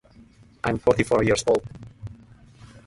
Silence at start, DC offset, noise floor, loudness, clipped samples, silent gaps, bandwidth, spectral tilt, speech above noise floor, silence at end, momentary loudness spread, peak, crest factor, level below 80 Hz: 0.65 s; under 0.1%; -52 dBFS; -22 LUFS; under 0.1%; none; 11.5 kHz; -5 dB/octave; 30 dB; 0.1 s; 21 LU; -4 dBFS; 20 dB; -48 dBFS